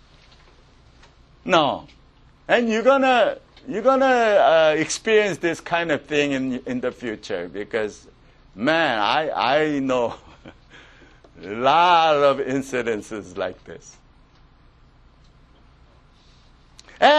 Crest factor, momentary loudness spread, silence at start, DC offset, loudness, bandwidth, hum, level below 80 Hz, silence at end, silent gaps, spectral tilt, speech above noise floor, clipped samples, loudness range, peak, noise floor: 20 dB; 16 LU; 1.45 s; under 0.1%; -20 LUFS; 11.5 kHz; none; -54 dBFS; 0 s; none; -4 dB/octave; 32 dB; under 0.1%; 8 LU; -2 dBFS; -52 dBFS